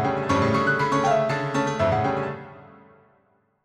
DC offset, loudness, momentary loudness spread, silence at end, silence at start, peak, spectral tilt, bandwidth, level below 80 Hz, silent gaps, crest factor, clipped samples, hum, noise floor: under 0.1%; -23 LUFS; 10 LU; 1 s; 0 s; -10 dBFS; -6 dB/octave; 11.5 kHz; -52 dBFS; none; 16 dB; under 0.1%; none; -65 dBFS